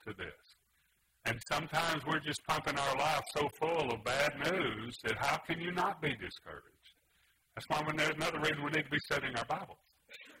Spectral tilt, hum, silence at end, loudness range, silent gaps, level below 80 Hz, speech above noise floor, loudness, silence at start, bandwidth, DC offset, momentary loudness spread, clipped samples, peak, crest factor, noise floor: -4 dB/octave; none; 0 s; 3 LU; none; -64 dBFS; 39 dB; -35 LUFS; 0.05 s; 16 kHz; under 0.1%; 15 LU; under 0.1%; -18 dBFS; 18 dB; -75 dBFS